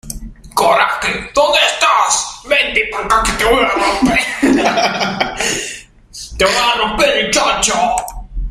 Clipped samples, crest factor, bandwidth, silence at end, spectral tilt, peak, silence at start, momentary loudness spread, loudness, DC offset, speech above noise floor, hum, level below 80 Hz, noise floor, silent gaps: under 0.1%; 14 dB; 15.5 kHz; 0 s; -2 dB/octave; 0 dBFS; 0.05 s; 10 LU; -13 LUFS; under 0.1%; 21 dB; none; -32 dBFS; -34 dBFS; none